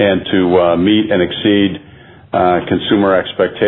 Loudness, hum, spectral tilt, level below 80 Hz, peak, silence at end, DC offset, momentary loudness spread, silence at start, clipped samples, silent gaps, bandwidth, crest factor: -13 LUFS; none; -10 dB/octave; -46 dBFS; 0 dBFS; 0 s; under 0.1%; 6 LU; 0 s; under 0.1%; none; 4.1 kHz; 12 dB